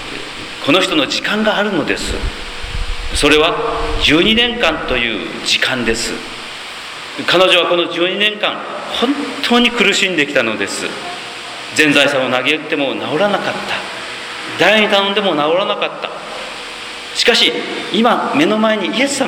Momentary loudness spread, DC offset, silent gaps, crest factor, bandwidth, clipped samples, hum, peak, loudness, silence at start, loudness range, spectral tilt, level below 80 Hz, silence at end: 15 LU; under 0.1%; none; 16 dB; 18.5 kHz; under 0.1%; none; 0 dBFS; -14 LUFS; 0 s; 2 LU; -3 dB/octave; -32 dBFS; 0 s